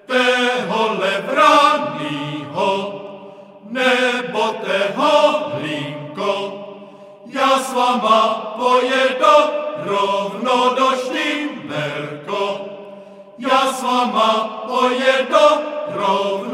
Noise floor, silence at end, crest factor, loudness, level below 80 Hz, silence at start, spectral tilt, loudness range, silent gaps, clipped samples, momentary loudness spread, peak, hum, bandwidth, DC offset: -39 dBFS; 0 s; 18 dB; -17 LUFS; -74 dBFS; 0.1 s; -3.5 dB/octave; 4 LU; none; under 0.1%; 13 LU; 0 dBFS; none; 15.5 kHz; under 0.1%